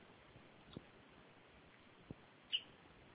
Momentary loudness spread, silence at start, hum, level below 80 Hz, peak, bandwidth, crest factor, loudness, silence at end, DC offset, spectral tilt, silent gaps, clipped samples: 21 LU; 0 s; none; -76 dBFS; -28 dBFS; 4 kHz; 26 dB; -47 LUFS; 0 s; under 0.1%; -1 dB/octave; none; under 0.1%